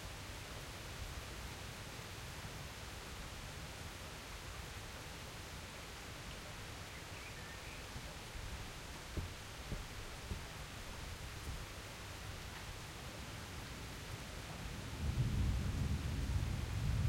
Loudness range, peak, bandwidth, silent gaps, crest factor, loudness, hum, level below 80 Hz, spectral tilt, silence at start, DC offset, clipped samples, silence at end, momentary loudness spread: 6 LU; -26 dBFS; 16.5 kHz; none; 18 dB; -46 LUFS; none; -50 dBFS; -4.5 dB/octave; 0 s; under 0.1%; under 0.1%; 0 s; 9 LU